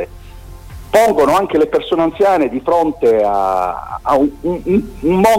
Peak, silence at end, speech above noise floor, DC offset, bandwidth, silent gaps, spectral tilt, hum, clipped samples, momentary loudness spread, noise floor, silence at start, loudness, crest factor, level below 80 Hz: -2 dBFS; 0 s; 20 dB; under 0.1%; 16.5 kHz; none; -6 dB/octave; none; under 0.1%; 7 LU; -33 dBFS; 0 s; -14 LUFS; 12 dB; -38 dBFS